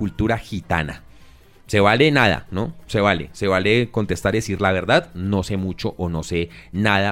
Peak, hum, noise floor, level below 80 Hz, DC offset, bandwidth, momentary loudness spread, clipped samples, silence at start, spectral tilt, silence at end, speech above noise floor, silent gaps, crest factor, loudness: -2 dBFS; none; -47 dBFS; -40 dBFS; under 0.1%; 16 kHz; 11 LU; under 0.1%; 0 s; -5.5 dB/octave; 0 s; 27 dB; none; 18 dB; -20 LUFS